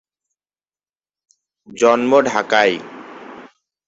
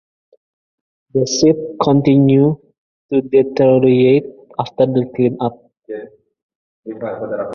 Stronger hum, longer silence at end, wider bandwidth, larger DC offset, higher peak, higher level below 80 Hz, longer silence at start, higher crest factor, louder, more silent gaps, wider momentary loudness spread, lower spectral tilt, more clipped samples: first, 50 Hz at -70 dBFS vs none; first, 0.4 s vs 0 s; first, 8 kHz vs 7 kHz; neither; about the same, -2 dBFS vs 0 dBFS; second, -64 dBFS vs -54 dBFS; first, 1.7 s vs 1.15 s; about the same, 18 dB vs 16 dB; about the same, -15 LUFS vs -15 LUFS; second, none vs 2.78-3.09 s, 6.42-6.49 s, 6.55-6.83 s; first, 22 LU vs 17 LU; second, -3.5 dB/octave vs -6.5 dB/octave; neither